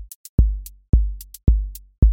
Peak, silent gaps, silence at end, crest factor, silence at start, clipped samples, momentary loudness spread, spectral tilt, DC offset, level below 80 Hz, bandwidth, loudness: -2 dBFS; 0.15-0.38 s, 0.89-0.93 s, 1.98-2.02 s; 0 s; 16 dB; 0 s; under 0.1%; 10 LU; -8.5 dB/octave; under 0.1%; -20 dBFS; 17 kHz; -22 LUFS